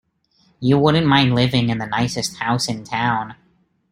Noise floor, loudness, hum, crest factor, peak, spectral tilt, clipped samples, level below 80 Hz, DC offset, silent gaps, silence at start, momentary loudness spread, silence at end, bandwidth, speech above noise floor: -60 dBFS; -18 LUFS; none; 18 dB; -2 dBFS; -5.5 dB/octave; under 0.1%; -50 dBFS; under 0.1%; none; 0.6 s; 8 LU; 0.55 s; 16 kHz; 42 dB